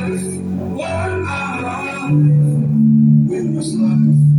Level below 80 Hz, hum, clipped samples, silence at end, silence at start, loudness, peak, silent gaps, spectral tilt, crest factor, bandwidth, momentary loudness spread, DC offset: -48 dBFS; none; under 0.1%; 0 s; 0 s; -16 LUFS; -2 dBFS; none; -8 dB/octave; 12 dB; 11 kHz; 10 LU; under 0.1%